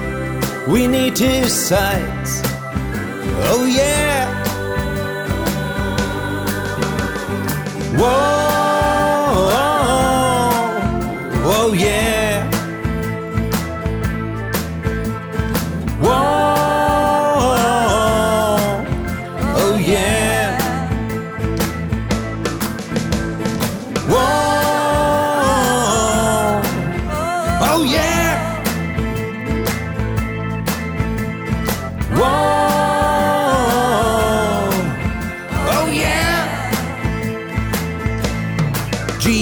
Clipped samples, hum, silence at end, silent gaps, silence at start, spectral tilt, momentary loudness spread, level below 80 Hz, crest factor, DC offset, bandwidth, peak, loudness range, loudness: under 0.1%; none; 0 s; none; 0 s; -4.5 dB/octave; 7 LU; -30 dBFS; 14 dB; under 0.1%; over 20 kHz; -4 dBFS; 5 LU; -17 LUFS